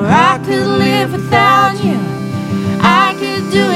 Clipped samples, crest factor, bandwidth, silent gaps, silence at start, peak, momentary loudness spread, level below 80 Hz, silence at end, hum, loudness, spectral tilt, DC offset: under 0.1%; 12 dB; 15 kHz; none; 0 s; 0 dBFS; 8 LU; -46 dBFS; 0 s; none; -12 LUFS; -5.5 dB/octave; under 0.1%